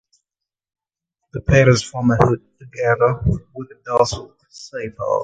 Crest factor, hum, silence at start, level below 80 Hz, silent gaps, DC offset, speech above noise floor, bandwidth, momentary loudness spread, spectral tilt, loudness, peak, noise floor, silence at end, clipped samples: 20 dB; none; 1.35 s; -36 dBFS; none; under 0.1%; 68 dB; 9.2 kHz; 20 LU; -6 dB/octave; -18 LUFS; 0 dBFS; -86 dBFS; 0 s; under 0.1%